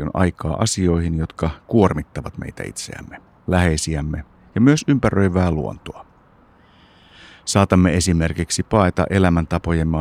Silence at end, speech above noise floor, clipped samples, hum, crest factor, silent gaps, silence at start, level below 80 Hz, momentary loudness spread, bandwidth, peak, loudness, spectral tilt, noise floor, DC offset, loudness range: 0 s; 33 dB; under 0.1%; none; 18 dB; none; 0 s; -38 dBFS; 15 LU; 14.5 kHz; 0 dBFS; -19 LUFS; -6 dB/octave; -52 dBFS; under 0.1%; 3 LU